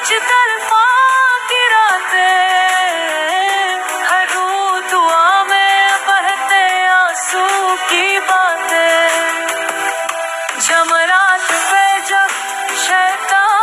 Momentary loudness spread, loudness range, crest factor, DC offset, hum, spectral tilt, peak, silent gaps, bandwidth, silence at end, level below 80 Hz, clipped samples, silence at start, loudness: 6 LU; 2 LU; 12 dB; under 0.1%; none; 2 dB/octave; -2 dBFS; none; 15 kHz; 0 s; -76 dBFS; under 0.1%; 0 s; -12 LUFS